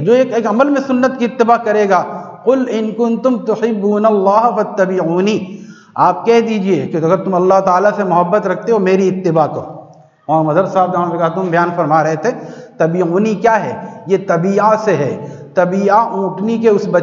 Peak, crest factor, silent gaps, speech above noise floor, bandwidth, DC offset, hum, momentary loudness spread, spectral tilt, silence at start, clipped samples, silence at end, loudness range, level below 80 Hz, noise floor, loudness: 0 dBFS; 14 dB; none; 26 dB; 7.4 kHz; under 0.1%; none; 7 LU; -7 dB/octave; 0 s; under 0.1%; 0 s; 2 LU; -62 dBFS; -39 dBFS; -14 LUFS